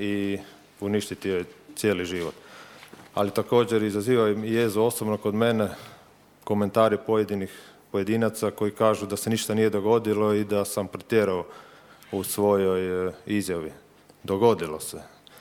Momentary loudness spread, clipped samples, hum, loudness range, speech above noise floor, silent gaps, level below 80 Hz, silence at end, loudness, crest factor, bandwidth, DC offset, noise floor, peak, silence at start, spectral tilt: 13 LU; under 0.1%; none; 3 LU; 30 dB; none; -64 dBFS; 0.35 s; -25 LUFS; 18 dB; 19 kHz; under 0.1%; -54 dBFS; -6 dBFS; 0 s; -5.5 dB/octave